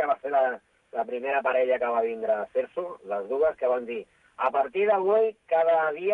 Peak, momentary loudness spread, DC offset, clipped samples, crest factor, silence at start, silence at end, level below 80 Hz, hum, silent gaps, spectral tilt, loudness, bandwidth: -12 dBFS; 11 LU; under 0.1%; under 0.1%; 14 dB; 0 s; 0 s; -70 dBFS; none; none; -6.5 dB/octave; -26 LUFS; 4.5 kHz